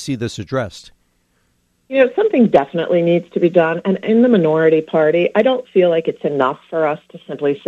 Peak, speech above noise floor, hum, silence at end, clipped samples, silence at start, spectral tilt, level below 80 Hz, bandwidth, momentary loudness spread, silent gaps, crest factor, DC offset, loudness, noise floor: 0 dBFS; 47 dB; none; 0.1 s; under 0.1%; 0 s; -7 dB/octave; -56 dBFS; 10 kHz; 10 LU; none; 16 dB; under 0.1%; -16 LUFS; -62 dBFS